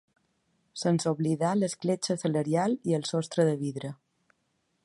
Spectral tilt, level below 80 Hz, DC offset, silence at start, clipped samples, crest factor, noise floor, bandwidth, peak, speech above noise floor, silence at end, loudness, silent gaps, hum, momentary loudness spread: -6 dB/octave; -74 dBFS; under 0.1%; 0.75 s; under 0.1%; 18 dB; -75 dBFS; 11.5 kHz; -12 dBFS; 48 dB; 0.9 s; -28 LUFS; none; none; 7 LU